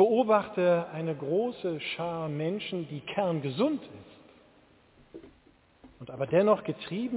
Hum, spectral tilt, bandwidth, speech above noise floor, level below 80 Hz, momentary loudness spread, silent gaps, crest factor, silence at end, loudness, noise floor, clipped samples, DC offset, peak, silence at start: none; -10.5 dB/octave; 4 kHz; 33 dB; -68 dBFS; 12 LU; none; 20 dB; 0 s; -29 LUFS; -62 dBFS; under 0.1%; under 0.1%; -10 dBFS; 0 s